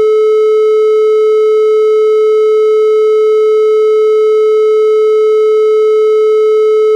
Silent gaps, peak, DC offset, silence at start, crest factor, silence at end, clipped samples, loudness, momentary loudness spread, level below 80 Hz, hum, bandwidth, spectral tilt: none; -2 dBFS; under 0.1%; 0 s; 4 dB; 0 s; under 0.1%; -9 LUFS; 0 LU; -86 dBFS; none; 7.8 kHz; -2 dB/octave